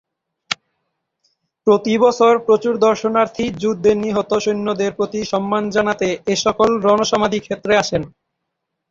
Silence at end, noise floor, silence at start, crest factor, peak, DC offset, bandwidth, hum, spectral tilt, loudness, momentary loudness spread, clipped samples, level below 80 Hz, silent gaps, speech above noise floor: 0.8 s; -77 dBFS; 0.5 s; 16 dB; -2 dBFS; under 0.1%; 7.6 kHz; none; -4.5 dB/octave; -17 LUFS; 8 LU; under 0.1%; -52 dBFS; none; 60 dB